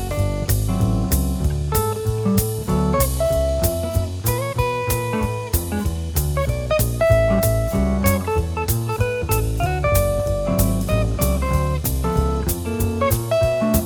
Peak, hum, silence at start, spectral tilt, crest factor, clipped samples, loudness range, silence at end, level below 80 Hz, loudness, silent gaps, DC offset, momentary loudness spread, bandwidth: -2 dBFS; none; 0 s; -6 dB/octave; 16 dB; under 0.1%; 2 LU; 0 s; -26 dBFS; -20 LUFS; none; under 0.1%; 4 LU; over 20 kHz